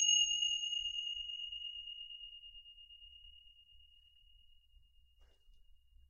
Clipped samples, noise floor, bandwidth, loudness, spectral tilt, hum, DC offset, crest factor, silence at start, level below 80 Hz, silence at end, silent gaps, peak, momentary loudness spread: under 0.1%; -66 dBFS; 10.5 kHz; -36 LUFS; 6 dB/octave; none; under 0.1%; 22 dB; 0 s; -68 dBFS; 0.35 s; none; -20 dBFS; 24 LU